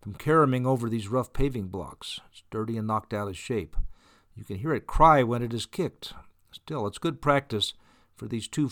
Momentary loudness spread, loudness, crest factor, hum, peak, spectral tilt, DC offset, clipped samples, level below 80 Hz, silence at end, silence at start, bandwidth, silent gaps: 18 LU; -27 LUFS; 22 dB; none; -6 dBFS; -6 dB/octave; under 0.1%; under 0.1%; -40 dBFS; 0 s; 0.05 s; 18.5 kHz; none